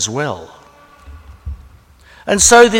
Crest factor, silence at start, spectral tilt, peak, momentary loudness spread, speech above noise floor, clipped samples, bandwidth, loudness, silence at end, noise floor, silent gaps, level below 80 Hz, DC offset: 16 dB; 0 s; -2 dB/octave; 0 dBFS; 26 LU; 33 dB; under 0.1%; 16.5 kHz; -12 LUFS; 0 s; -44 dBFS; none; -36 dBFS; under 0.1%